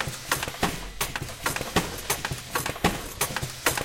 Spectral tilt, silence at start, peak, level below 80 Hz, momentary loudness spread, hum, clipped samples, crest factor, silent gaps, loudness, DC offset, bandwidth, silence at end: -3 dB/octave; 0 s; -6 dBFS; -44 dBFS; 4 LU; none; under 0.1%; 24 dB; none; -28 LUFS; under 0.1%; 17 kHz; 0 s